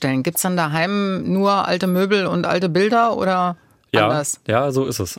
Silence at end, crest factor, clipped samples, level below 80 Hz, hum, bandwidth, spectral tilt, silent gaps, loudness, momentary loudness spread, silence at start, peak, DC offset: 0.05 s; 18 dB; under 0.1%; -60 dBFS; none; 16.5 kHz; -5 dB/octave; none; -19 LUFS; 4 LU; 0 s; -2 dBFS; under 0.1%